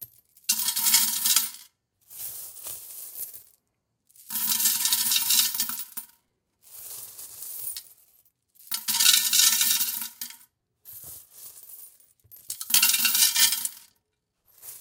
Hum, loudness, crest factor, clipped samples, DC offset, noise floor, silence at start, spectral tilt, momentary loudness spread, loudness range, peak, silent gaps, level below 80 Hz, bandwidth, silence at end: none; -21 LUFS; 26 dB; under 0.1%; under 0.1%; -77 dBFS; 0 s; 3.5 dB/octave; 23 LU; 7 LU; -2 dBFS; none; -78 dBFS; 19 kHz; 0 s